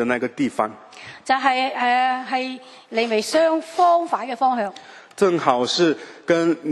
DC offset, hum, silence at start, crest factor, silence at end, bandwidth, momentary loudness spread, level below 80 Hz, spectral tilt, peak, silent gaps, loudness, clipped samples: under 0.1%; none; 0 s; 20 dB; 0 s; 12.5 kHz; 12 LU; -70 dBFS; -4 dB/octave; -2 dBFS; none; -20 LUFS; under 0.1%